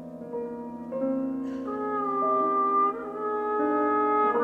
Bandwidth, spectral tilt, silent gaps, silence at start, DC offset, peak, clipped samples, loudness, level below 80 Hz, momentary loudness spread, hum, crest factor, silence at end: 4.8 kHz; -8 dB/octave; none; 0 s; under 0.1%; -14 dBFS; under 0.1%; -27 LUFS; -66 dBFS; 12 LU; none; 14 dB; 0 s